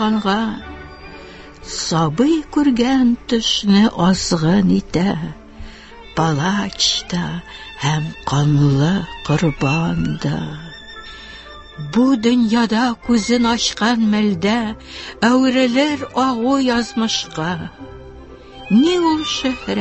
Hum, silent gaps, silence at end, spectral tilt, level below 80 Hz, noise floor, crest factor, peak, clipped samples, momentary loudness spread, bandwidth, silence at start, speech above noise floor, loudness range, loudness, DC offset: none; none; 0 s; -5 dB/octave; -42 dBFS; -38 dBFS; 16 dB; -2 dBFS; under 0.1%; 19 LU; 8.4 kHz; 0 s; 21 dB; 4 LU; -17 LUFS; under 0.1%